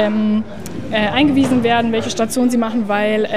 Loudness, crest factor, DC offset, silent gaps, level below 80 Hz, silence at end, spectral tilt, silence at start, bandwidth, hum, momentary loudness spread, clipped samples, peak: -16 LUFS; 14 dB; 2%; none; -46 dBFS; 0 s; -5 dB/octave; 0 s; 15.5 kHz; none; 7 LU; under 0.1%; -2 dBFS